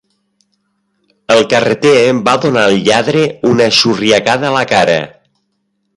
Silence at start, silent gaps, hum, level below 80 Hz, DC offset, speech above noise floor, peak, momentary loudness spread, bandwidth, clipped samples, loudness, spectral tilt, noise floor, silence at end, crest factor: 1.3 s; none; none; -50 dBFS; under 0.1%; 55 dB; 0 dBFS; 4 LU; 11.5 kHz; under 0.1%; -10 LUFS; -4 dB/octave; -65 dBFS; 0.9 s; 12 dB